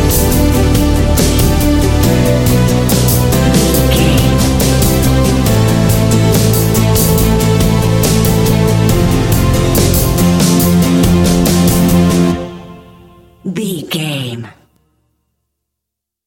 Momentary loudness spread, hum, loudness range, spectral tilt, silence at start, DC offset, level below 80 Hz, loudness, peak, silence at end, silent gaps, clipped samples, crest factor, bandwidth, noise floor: 8 LU; none; 6 LU; -5.5 dB/octave; 0 s; under 0.1%; -20 dBFS; -11 LUFS; 0 dBFS; 1.75 s; none; under 0.1%; 10 dB; 17 kHz; -79 dBFS